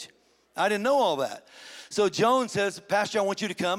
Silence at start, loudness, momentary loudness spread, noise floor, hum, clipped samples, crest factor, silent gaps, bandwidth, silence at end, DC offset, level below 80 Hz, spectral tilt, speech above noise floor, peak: 0 s; -26 LUFS; 19 LU; -61 dBFS; none; under 0.1%; 16 dB; none; 16.5 kHz; 0 s; under 0.1%; -72 dBFS; -4 dB/octave; 35 dB; -10 dBFS